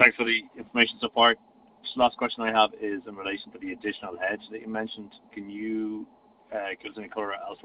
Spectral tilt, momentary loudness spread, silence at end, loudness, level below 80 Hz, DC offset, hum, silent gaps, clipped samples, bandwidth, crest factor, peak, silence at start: 0 dB/octave; 16 LU; 0.1 s; -27 LUFS; -66 dBFS; under 0.1%; none; none; under 0.1%; 5.4 kHz; 26 dB; -2 dBFS; 0 s